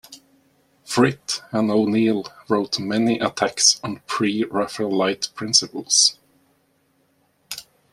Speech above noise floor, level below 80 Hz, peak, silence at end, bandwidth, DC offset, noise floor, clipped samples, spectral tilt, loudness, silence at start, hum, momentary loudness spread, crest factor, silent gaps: 43 dB; -64 dBFS; -2 dBFS; 0.3 s; 15 kHz; under 0.1%; -64 dBFS; under 0.1%; -2.5 dB/octave; -20 LUFS; 0.1 s; none; 12 LU; 22 dB; none